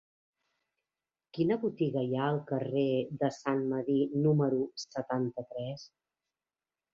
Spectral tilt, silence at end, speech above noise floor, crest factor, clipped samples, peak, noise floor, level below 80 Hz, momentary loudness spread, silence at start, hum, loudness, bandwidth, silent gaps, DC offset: -7.5 dB/octave; 1.05 s; over 59 dB; 18 dB; under 0.1%; -14 dBFS; under -90 dBFS; -72 dBFS; 11 LU; 1.35 s; none; -32 LUFS; 7.6 kHz; none; under 0.1%